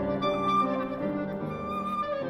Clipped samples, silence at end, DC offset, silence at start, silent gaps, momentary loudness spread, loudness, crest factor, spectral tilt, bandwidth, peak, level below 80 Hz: under 0.1%; 0 s; under 0.1%; 0 s; none; 7 LU; -29 LUFS; 14 dB; -7.5 dB/octave; 13 kHz; -16 dBFS; -54 dBFS